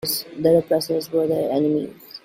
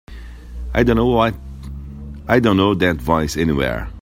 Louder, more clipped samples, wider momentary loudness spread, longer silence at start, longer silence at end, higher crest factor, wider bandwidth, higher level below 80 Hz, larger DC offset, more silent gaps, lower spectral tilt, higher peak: second, -21 LUFS vs -17 LUFS; neither; second, 7 LU vs 19 LU; about the same, 0.05 s vs 0.1 s; about the same, 0.05 s vs 0 s; about the same, 16 dB vs 18 dB; about the same, 16 kHz vs 16.5 kHz; second, -60 dBFS vs -32 dBFS; neither; neither; about the same, -5.5 dB/octave vs -6.5 dB/octave; second, -6 dBFS vs 0 dBFS